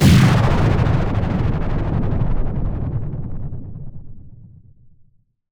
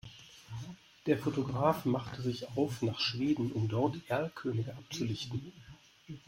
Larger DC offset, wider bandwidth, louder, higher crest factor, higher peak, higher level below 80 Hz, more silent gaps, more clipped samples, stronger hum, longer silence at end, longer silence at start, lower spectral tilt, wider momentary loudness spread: neither; first, over 20 kHz vs 16.5 kHz; first, -19 LUFS vs -34 LUFS; second, 16 dB vs 22 dB; first, -2 dBFS vs -14 dBFS; first, -24 dBFS vs -66 dBFS; neither; neither; neither; first, 1.1 s vs 0.1 s; about the same, 0 s vs 0.05 s; about the same, -7 dB/octave vs -6.5 dB/octave; first, 19 LU vs 16 LU